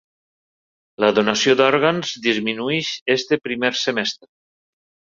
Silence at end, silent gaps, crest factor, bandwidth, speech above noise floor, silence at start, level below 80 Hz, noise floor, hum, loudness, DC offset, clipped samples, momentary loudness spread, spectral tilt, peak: 1 s; 3.01-3.06 s; 20 dB; 7.6 kHz; over 71 dB; 1 s; -64 dBFS; under -90 dBFS; none; -19 LUFS; under 0.1%; under 0.1%; 7 LU; -3.5 dB/octave; 0 dBFS